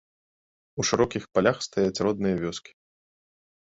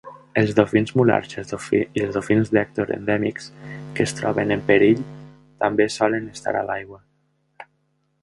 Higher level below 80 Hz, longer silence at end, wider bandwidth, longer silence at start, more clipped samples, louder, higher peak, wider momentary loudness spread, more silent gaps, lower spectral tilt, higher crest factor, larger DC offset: about the same, -56 dBFS vs -54 dBFS; first, 1.05 s vs 0.6 s; second, 8 kHz vs 11.5 kHz; first, 0.75 s vs 0.05 s; neither; second, -26 LUFS vs -21 LUFS; second, -6 dBFS vs 0 dBFS; second, 9 LU vs 13 LU; neither; second, -4.5 dB/octave vs -6 dB/octave; about the same, 22 dB vs 22 dB; neither